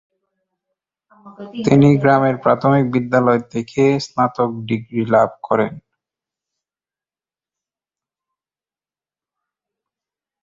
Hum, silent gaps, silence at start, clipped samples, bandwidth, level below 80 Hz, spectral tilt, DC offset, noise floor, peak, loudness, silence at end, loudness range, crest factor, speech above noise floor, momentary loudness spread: none; none; 1.25 s; under 0.1%; 7.6 kHz; -56 dBFS; -7.5 dB/octave; under 0.1%; under -90 dBFS; -2 dBFS; -16 LUFS; 4.65 s; 7 LU; 18 dB; over 74 dB; 11 LU